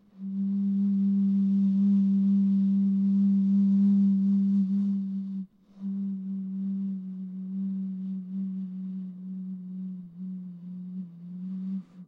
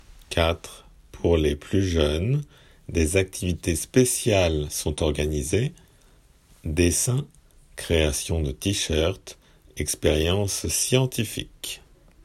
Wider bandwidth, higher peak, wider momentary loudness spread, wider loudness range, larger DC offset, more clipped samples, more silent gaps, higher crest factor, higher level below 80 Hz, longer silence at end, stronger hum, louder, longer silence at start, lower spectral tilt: second, 1.3 kHz vs 16 kHz; second, -18 dBFS vs -6 dBFS; about the same, 16 LU vs 14 LU; first, 13 LU vs 2 LU; neither; neither; neither; second, 10 dB vs 20 dB; second, -80 dBFS vs -38 dBFS; second, 0.05 s vs 0.5 s; neither; second, -27 LUFS vs -24 LUFS; second, 0.15 s vs 0.3 s; first, -12 dB/octave vs -4.5 dB/octave